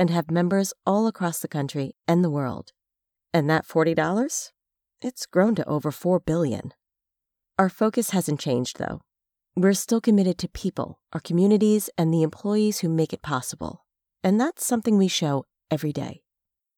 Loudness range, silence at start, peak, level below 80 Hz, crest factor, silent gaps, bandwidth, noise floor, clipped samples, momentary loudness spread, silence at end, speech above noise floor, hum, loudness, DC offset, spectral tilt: 3 LU; 0 s; -6 dBFS; -58 dBFS; 20 dB; none; 19 kHz; -86 dBFS; under 0.1%; 12 LU; 0.6 s; 63 dB; none; -24 LUFS; under 0.1%; -5.5 dB/octave